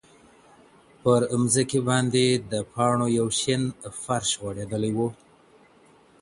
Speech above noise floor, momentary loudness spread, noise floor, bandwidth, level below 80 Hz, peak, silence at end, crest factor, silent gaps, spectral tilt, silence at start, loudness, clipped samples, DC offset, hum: 32 dB; 9 LU; -56 dBFS; 11.5 kHz; -58 dBFS; -8 dBFS; 1.05 s; 18 dB; none; -4.5 dB/octave; 1.05 s; -24 LUFS; under 0.1%; under 0.1%; none